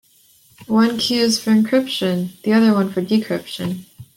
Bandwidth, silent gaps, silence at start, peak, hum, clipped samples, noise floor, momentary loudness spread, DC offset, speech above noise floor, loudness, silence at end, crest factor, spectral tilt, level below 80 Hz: 16.5 kHz; none; 0.6 s; -4 dBFS; none; under 0.1%; -53 dBFS; 10 LU; under 0.1%; 36 dB; -18 LUFS; 0.1 s; 14 dB; -5 dB/octave; -60 dBFS